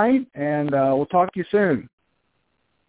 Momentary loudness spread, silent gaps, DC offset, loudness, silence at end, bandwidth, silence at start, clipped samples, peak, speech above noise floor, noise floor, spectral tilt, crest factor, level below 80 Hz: 5 LU; none; under 0.1%; -21 LUFS; 1 s; 4 kHz; 0 s; under 0.1%; -6 dBFS; 50 dB; -70 dBFS; -11.5 dB/octave; 16 dB; -60 dBFS